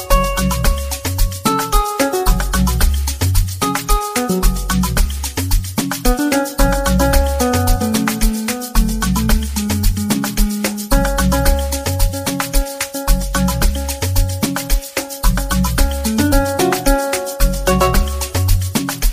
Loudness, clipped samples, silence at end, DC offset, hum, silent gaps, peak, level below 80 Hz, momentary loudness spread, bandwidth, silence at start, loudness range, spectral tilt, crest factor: -17 LUFS; under 0.1%; 0 s; 0.4%; none; none; 0 dBFS; -18 dBFS; 4 LU; 15.5 kHz; 0 s; 2 LU; -4.5 dB/octave; 16 dB